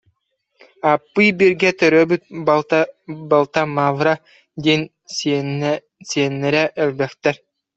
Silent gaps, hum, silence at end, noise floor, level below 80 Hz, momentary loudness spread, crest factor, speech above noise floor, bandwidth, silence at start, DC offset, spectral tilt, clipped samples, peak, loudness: none; none; 0.4 s; -69 dBFS; -62 dBFS; 10 LU; 18 dB; 52 dB; 8.2 kHz; 0.85 s; under 0.1%; -5 dB/octave; under 0.1%; 0 dBFS; -18 LUFS